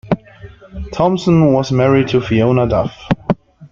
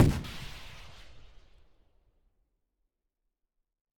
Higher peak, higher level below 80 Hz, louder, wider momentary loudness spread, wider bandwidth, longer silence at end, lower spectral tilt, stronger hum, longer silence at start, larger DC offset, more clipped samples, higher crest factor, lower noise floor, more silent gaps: first, -2 dBFS vs -14 dBFS; first, -36 dBFS vs -46 dBFS; first, -15 LUFS vs -34 LUFS; second, 10 LU vs 22 LU; second, 7.4 kHz vs 19 kHz; second, 0.05 s vs 2.8 s; about the same, -7.5 dB/octave vs -6.5 dB/octave; neither; about the same, 0.05 s vs 0 s; neither; neither; second, 14 dB vs 22 dB; second, -38 dBFS vs -84 dBFS; neither